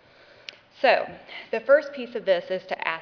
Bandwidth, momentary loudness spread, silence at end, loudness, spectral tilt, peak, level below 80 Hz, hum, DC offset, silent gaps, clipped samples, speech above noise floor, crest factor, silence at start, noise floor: 5.4 kHz; 21 LU; 0 s; -24 LUFS; -4.5 dB/octave; -4 dBFS; -72 dBFS; none; under 0.1%; none; under 0.1%; 22 dB; 22 dB; 0.8 s; -46 dBFS